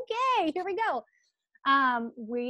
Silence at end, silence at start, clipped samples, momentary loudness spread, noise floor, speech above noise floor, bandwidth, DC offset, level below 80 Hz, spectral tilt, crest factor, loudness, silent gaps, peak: 0 s; 0 s; under 0.1%; 9 LU; -56 dBFS; 28 dB; 8.8 kHz; under 0.1%; -78 dBFS; -3.5 dB/octave; 16 dB; -28 LUFS; none; -12 dBFS